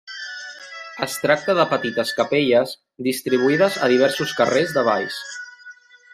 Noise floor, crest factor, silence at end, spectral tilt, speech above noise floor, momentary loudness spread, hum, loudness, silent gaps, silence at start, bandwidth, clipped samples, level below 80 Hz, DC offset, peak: -45 dBFS; 18 dB; 0.4 s; -4.5 dB/octave; 25 dB; 16 LU; none; -20 LUFS; none; 0.05 s; 15.5 kHz; under 0.1%; -66 dBFS; under 0.1%; -2 dBFS